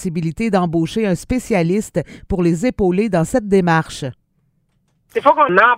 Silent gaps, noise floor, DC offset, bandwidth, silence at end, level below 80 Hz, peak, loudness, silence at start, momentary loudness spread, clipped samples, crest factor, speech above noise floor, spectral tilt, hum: none; -63 dBFS; under 0.1%; 15.5 kHz; 0 s; -38 dBFS; 0 dBFS; -17 LUFS; 0 s; 11 LU; under 0.1%; 16 dB; 47 dB; -6.5 dB/octave; none